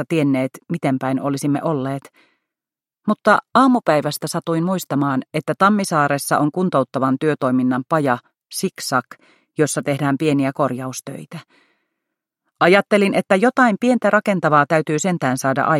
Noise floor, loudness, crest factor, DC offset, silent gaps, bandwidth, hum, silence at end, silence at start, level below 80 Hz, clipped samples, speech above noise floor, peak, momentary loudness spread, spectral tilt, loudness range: under -90 dBFS; -18 LUFS; 18 dB; under 0.1%; none; 16 kHz; none; 0 s; 0 s; -66 dBFS; under 0.1%; over 72 dB; 0 dBFS; 10 LU; -5.5 dB/octave; 6 LU